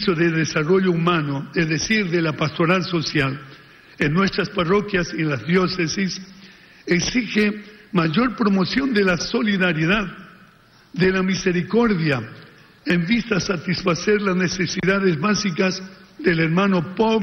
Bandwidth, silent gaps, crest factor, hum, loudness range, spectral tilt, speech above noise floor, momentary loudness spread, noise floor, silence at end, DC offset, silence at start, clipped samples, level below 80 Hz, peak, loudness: 6.8 kHz; none; 14 dB; none; 2 LU; -5.5 dB/octave; 32 dB; 6 LU; -52 dBFS; 0 s; under 0.1%; 0 s; under 0.1%; -48 dBFS; -6 dBFS; -20 LUFS